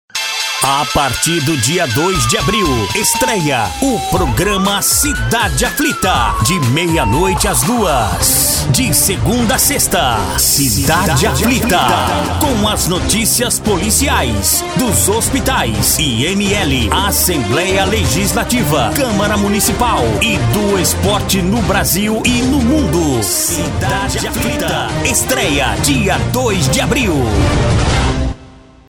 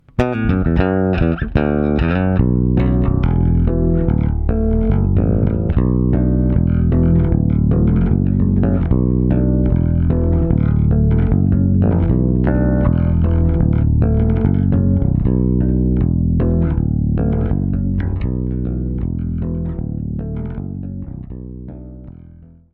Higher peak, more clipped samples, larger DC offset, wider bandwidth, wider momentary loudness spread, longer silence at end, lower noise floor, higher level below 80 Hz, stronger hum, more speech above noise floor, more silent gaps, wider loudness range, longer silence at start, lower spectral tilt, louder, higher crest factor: about the same, 0 dBFS vs 0 dBFS; neither; neither; first, over 20 kHz vs 4.2 kHz; second, 4 LU vs 9 LU; about the same, 0.35 s vs 0.3 s; about the same, -38 dBFS vs -41 dBFS; about the same, -26 dBFS vs -22 dBFS; neither; about the same, 25 dB vs 26 dB; neither; second, 2 LU vs 7 LU; about the same, 0.15 s vs 0.2 s; second, -3.5 dB/octave vs -11.5 dB/octave; first, -13 LUFS vs -16 LUFS; about the same, 12 dB vs 14 dB